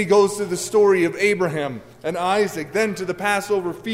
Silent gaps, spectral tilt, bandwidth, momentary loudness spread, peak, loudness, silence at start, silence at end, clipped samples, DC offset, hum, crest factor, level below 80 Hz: none; -4.5 dB/octave; 16 kHz; 9 LU; -6 dBFS; -20 LUFS; 0 s; 0 s; under 0.1%; under 0.1%; none; 14 dB; -58 dBFS